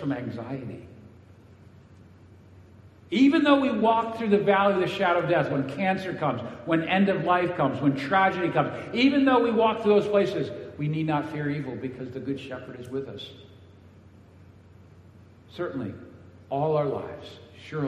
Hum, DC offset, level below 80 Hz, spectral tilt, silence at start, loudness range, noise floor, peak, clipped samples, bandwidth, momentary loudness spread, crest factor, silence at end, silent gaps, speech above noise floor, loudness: none; under 0.1%; -64 dBFS; -7.5 dB/octave; 0 s; 16 LU; -51 dBFS; -6 dBFS; under 0.1%; 9.4 kHz; 16 LU; 20 dB; 0 s; none; 27 dB; -25 LUFS